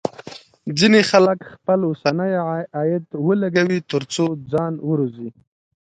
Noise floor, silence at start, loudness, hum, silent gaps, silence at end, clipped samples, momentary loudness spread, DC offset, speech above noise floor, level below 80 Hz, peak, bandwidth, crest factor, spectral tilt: -40 dBFS; 0.05 s; -19 LUFS; none; none; 0.65 s; under 0.1%; 14 LU; under 0.1%; 21 dB; -62 dBFS; 0 dBFS; 9.4 kHz; 20 dB; -5.5 dB/octave